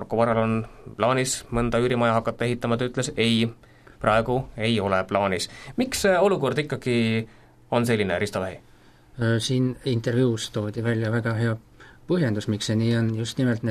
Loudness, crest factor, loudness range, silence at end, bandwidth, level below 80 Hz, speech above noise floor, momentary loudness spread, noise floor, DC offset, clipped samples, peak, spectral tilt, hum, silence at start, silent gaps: -24 LUFS; 20 dB; 2 LU; 0 s; 14 kHz; -48 dBFS; 28 dB; 7 LU; -51 dBFS; under 0.1%; under 0.1%; -4 dBFS; -5.5 dB/octave; none; 0 s; none